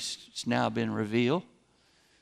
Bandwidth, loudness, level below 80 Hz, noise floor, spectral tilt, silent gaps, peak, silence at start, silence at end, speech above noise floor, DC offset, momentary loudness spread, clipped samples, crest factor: 13.5 kHz; -30 LUFS; -70 dBFS; -66 dBFS; -5 dB/octave; none; -12 dBFS; 0 s; 0.8 s; 37 dB; under 0.1%; 7 LU; under 0.1%; 18 dB